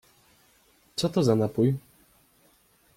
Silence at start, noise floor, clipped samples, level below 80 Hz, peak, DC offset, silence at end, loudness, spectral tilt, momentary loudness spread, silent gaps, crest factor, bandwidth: 0.95 s; -63 dBFS; under 0.1%; -62 dBFS; -10 dBFS; under 0.1%; 1.2 s; -26 LUFS; -7 dB/octave; 11 LU; none; 18 dB; 16.5 kHz